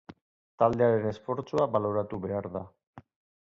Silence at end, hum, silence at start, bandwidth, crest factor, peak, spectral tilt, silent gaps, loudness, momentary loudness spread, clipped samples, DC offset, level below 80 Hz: 0.4 s; none; 0.1 s; 7.6 kHz; 20 dB; -10 dBFS; -8.5 dB/octave; 0.21-0.58 s, 2.87-2.93 s; -29 LUFS; 13 LU; under 0.1%; under 0.1%; -58 dBFS